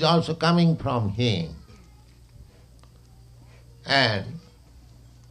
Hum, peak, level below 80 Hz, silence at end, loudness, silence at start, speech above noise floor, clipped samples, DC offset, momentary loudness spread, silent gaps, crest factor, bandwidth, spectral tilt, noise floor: none; -6 dBFS; -52 dBFS; 0.9 s; -23 LUFS; 0 s; 29 dB; under 0.1%; under 0.1%; 21 LU; none; 20 dB; 10 kHz; -6 dB/octave; -51 dBFS